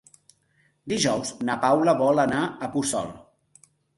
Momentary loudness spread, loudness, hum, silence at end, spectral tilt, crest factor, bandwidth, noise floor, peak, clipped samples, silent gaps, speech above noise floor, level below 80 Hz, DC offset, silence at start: 10 LU; -24 LUFS; none; 0.8 s; -4.5 dB/octave; 18 dB; 12 kHz; -66 dBFS; -6 dBFS; under 0.1%; none; 43 dB; -60 dBFS; under 0.1%; 0.85 s